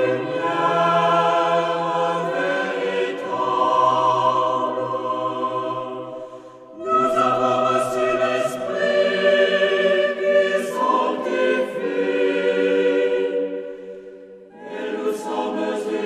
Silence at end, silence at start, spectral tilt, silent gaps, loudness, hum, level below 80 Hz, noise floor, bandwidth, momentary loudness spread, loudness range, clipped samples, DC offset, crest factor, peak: 0 s; 0 s; -5 dB/octave; none; -20 LUFS; none; -66 dBFS; -41 dBFS; 13.5 kHz; 13 LU; 4 LU; under 0.1%; under 0.1%; 16 dB; -4 dBFS